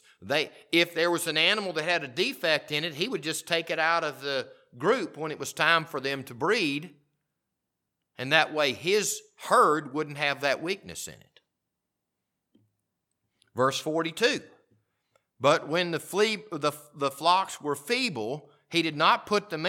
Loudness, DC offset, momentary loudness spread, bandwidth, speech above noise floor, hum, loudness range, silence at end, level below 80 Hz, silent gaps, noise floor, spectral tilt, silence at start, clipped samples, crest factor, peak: -27 LUFS; under 0.1%; 11 LU; 18.5 kHz; 57 dB; none; 6 LU; 0 s; -76 dBFS; none; -84 dBFS; -3 dB/octave; 0.2 s; under 0.1%; 24 dB; -4 dBFS